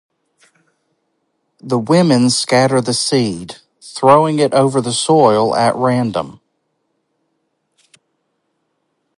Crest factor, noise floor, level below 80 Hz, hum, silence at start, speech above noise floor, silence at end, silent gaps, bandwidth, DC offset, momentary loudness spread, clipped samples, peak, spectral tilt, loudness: 16 dB; -68 dBFS; -58 dBFS; none; 1.65 s; 55 dB; 2.85 s; none; 11.5 kHz; under 0.1%; 14 LU; under 0.1%; 0 dBFS; -5 dB/octave; -14 LUFS